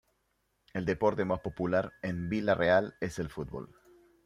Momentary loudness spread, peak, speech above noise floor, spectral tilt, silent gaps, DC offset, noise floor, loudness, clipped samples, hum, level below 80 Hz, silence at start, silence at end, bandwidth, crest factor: 14 LU; -12 dBFS; 46 dB; -7 dB/octave; none; under 0.1%; -77 dBFS; -31 LUFS; under 0.1%; none; -58 dBFS; 0.75 s; 0.6 s; 13.5 kHz; 20 dB